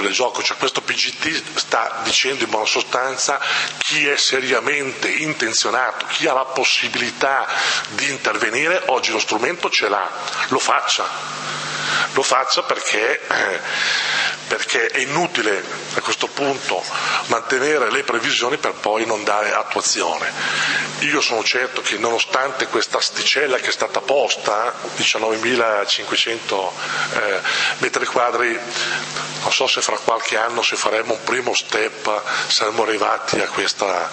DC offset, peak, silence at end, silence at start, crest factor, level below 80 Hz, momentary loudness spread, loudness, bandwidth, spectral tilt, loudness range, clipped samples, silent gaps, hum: under 0.1%; 0 dBFS; 0 s; 0 s; 20 dB; -68 dBFS; 5 LU; -18 LUFS; 8.8 kHz; -1 dB/octave; 2 LU; under 0.1%; none; none